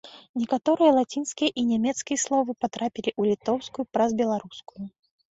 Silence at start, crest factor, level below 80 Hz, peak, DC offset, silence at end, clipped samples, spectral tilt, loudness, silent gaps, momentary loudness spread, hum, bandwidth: 0.05 s; 18 dB; -66 dBFS; -8 dBFS; under 0.1%; 0.4 s; under 0.1%; -4 dB/octave; -25 LUFS; 0.29-0.34 s; 16 LU; none; 8 kHz